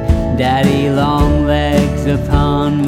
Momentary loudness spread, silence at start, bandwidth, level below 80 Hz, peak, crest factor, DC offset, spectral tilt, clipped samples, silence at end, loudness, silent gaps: 2 LU; 0 s; 15.5 kHz; -20 dBFS; 0 dBFS; 12 dB; under 0.1%; -7 dB/octave; under 0.1%; 0 s; -14 LUFS; none